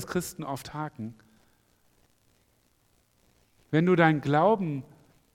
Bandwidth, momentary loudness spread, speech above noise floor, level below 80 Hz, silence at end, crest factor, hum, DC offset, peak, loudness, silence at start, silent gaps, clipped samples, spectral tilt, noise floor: 16.5 kHz; 16 LU; 42 dB; -64 dBFS; 0.55 s; 24 dB; none; under 0.1%; -6 dBFS; -26 LUFS; 0 s; none; under 0.1%; -6.5 dB/octave; -68 dBFS